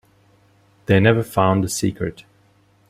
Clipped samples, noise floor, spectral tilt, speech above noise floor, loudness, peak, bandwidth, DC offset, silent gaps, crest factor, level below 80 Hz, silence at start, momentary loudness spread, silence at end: under 0.1%; -57 dBFS; -6 dB/octave; 39 dB; -19 LUFS; -2 dBFS; 15.5 kHz; under 0.1%; none; 20 dB; -50 dBFS; 0.9 s; 13 LU; 0.7 s